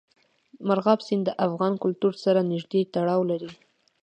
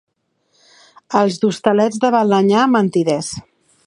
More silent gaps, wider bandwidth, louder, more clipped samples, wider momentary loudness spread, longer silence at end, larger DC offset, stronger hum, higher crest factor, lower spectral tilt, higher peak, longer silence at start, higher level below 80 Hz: neither; second, 8.8 kHz vs 11 kHz; second, -25 LUFS vs -16 LUFS; neither; about the same, 6 LU vs 8 LU; about the same, 0.5 s vs 0.45 s; neither; neither; about the same, 20 dB vs 16 dB; first, -8 dB/octave vs -5.5 dB/octave; second, -6 dBFS vs 0 dBFS; second, 0.6 s vs 1.1 s; second, -74 dBFS vs -58 dBFS